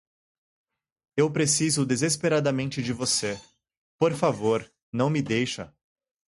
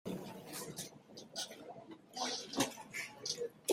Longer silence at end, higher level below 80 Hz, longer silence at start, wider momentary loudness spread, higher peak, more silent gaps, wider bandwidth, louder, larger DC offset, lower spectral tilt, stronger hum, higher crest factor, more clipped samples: first, 0.6 s vs 0 s; first, -62 dBFS vs -78 dBFS; first, 1.15 s vs 0.05 s; second, 11 LU vs 14 LU; first, -8 dBFS vs -18 dBFS; first, 3.77-3.99 s, 4.82-4.93 s vs none; second, 11.5 kHz vs 16 kHz; first, -25 LUFS vs -42 LUFS; neither; first, -4 dB/octave vs -2.5 dB/octave; neither; about the same, 20 dB vs 24 dB; neither